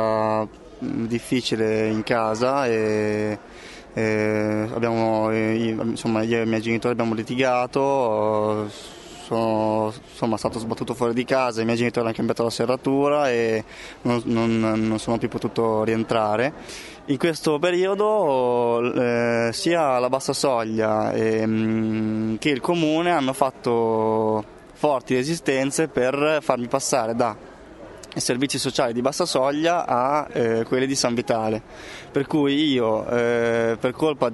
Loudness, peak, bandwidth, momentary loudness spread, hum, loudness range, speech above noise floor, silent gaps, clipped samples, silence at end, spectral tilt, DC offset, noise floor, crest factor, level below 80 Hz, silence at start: -22 LUFS; 0 dBFS; 11.5 kHz; 8 LU; none; 2 LU; 20 dB; none; under 0.1%; 0 s; -5 dB/octave; under 0.1%; -42 dBFS; 22 dB; -54 dBFS; 0 s